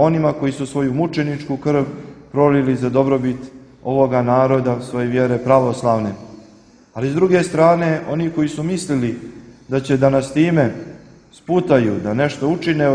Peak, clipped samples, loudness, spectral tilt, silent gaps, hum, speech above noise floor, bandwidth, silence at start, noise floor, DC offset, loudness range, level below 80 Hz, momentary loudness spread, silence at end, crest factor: 0 dBFS; under 0.1%; -18 LUFS; -7.5 dB/octave; none; none; 30 dB; 10.5 kHz; 0 s; -47 dBFS; under 0.1%; 2 LU; -50 dBFS; 12 LU; 0 s; 18 dB